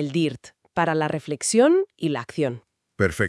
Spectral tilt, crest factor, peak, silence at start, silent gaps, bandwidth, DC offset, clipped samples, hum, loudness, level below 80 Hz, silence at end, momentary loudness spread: -5 dB/octave; 18 dB; -4 dBFS; 0 s; none; 12 kHz; under 0.1%; under 0.1%; none; -23 LUFS; -56 dBFS; 0 s; 11 LU